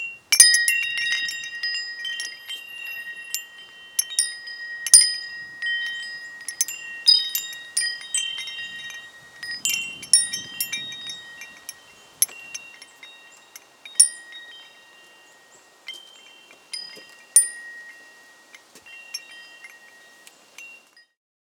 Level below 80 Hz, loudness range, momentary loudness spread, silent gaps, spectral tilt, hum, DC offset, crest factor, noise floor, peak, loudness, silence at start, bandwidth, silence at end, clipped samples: -78 dBFS; 10 LU; 26 LU; none; 4 dB/octave; none; under 0.1%; 26 dB; -53 dBFS; 0 dBFS; -20 LUFS; 0 s; over 20 kHz; 0.7 s; under 0.1%